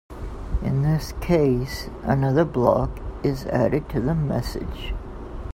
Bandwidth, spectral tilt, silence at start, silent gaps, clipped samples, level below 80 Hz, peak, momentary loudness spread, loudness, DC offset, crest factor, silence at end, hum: 16 kHz; -7.5 dB/octave; 0.1 s; none; under 0.1%; -34 dBFS; -2 dBFS; 14 LU; -23 LUFS; under 0.1%; 20 dB; 0 s; none